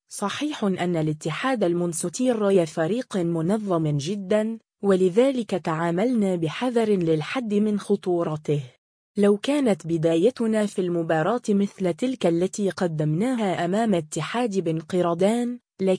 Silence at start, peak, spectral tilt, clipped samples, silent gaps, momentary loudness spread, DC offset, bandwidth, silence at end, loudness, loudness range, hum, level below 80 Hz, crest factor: 0.1 s; -8 dBFS; -6 dB/octave; under 0.1%; 8.78-9.14 s; 6 LU; under 0.1%; 10.5 kHz; 0 s; -24 LUFS; 1 LU; none; -66 dBFS; 16 dB